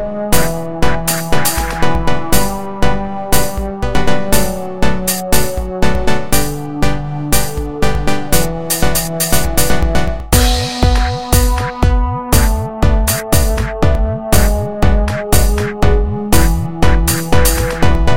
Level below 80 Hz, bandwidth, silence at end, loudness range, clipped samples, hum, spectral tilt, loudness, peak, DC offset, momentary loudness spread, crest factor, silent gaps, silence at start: -18 dBFS; 17.5 kHz; 0 s; 3 LU; 0.1%; none; -4.5 dB/octave; -15 LUFS; 0 dBFS; 10%; 5 LU; 14 dB; none; 0 s